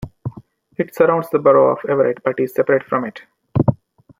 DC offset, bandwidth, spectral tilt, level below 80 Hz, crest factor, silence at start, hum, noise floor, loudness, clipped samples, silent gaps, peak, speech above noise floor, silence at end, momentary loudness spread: under 0.1%; 16 kHz; -9 dB/octave; -50 dBFS; 16 dB; 0 s; none; -43 dBFS; -17 LUFS; under 0.1%; none; -2 dBFS; 26 dB; 0.45 s; 18 LU